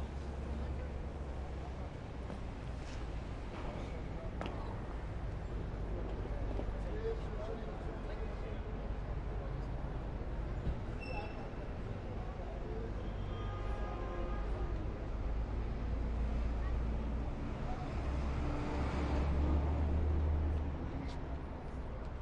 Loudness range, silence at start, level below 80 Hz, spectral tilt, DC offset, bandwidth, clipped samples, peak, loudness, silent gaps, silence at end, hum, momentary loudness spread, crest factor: 7 LU; 0 s; -40 dBFS; -8 dB/octave; under 0.1%; 8.4 kHz; under 0.1%; -22 dBFS; -41 LUFS; none; 0 s; none; 9 LU; 16 dB